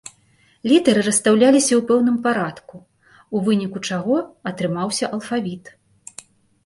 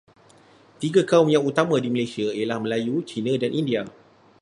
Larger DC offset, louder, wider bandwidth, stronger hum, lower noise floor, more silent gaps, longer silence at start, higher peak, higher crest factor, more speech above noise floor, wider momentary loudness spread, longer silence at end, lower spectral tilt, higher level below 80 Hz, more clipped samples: neither; first, -19 LUFS vs -23 LUFS; about the same, 11.5 kHz vs 11.5 kHz; neither; first, -58 dBFS vs -53 dBFS; neither; second, 0.65 s vs 0.8 s; about the same, -2 dBFS vs -2 dBFS; about the same, 18 dB vs 20 dB; first, 39 dB vs 31 dB; first, 16 LU vs 9 LU; first, 1 s vs 0.5 s; second, -4.5 dB/octave vs -6 dB/octave; first, -62 dBFS vs -68 dBFS; neither